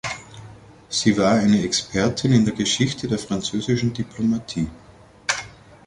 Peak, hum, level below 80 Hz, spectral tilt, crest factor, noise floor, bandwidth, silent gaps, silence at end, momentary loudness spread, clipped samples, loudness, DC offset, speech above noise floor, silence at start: -4 dBFS; none; -48 dBFS; -4.5 dB/octave; 18 dB; -44 dBFS; 11.5 kHz; none; 0.35 s; 12 LU; under 0.1%; -21 LUFS; under 0.1%; 23 dB; 0.05 s